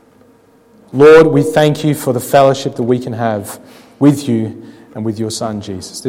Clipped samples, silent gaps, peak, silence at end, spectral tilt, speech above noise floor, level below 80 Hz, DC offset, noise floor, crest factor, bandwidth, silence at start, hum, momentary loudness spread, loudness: under 0.1%; none; 0 dBFS; 0 s; -6 dB/octave; 35 dB; -50 dBFS; under 0.1%; -47 dBFS; 14 dB; 16.5 kHz; 0.95 s; none; 18 LU; -12 LUFS